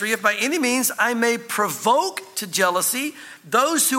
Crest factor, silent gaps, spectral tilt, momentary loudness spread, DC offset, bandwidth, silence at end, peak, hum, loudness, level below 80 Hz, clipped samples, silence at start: 18 dB; none; -1.5 dB/octave; 7 LU; under 0.1%; 17 kHz; 0 s; -4 dBFS; none; -20 LUFS; -80 dBFS; under 0.1%; 0 s